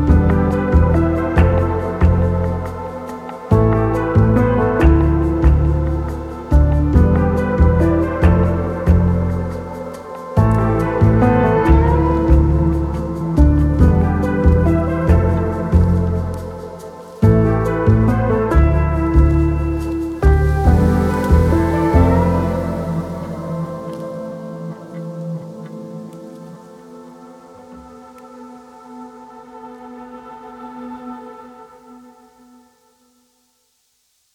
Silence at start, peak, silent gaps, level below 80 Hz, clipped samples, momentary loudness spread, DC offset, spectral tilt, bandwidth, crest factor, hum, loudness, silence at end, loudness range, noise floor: 0 s; 0 dBFS; none; -20 dBFS; under 0.1%; 19 LU; under 0.1%; -9.5 dB/octave; 7.8 kHz; 14 dB; none; -16 LUFS; 2.4 s; 20 LU; -63 dBFS